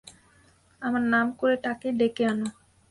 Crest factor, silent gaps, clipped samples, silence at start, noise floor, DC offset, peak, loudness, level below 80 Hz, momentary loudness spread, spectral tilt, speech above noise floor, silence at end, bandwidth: 16 dB; none; under 0.1%; 0.05 s; -60 dBFS; under 0.1%; -12 dBFS; -26 LUFS; -64 dBFS; 8 LU; -5.5 dB/octave; 35 dB; 0.4 s; 11.5 kHz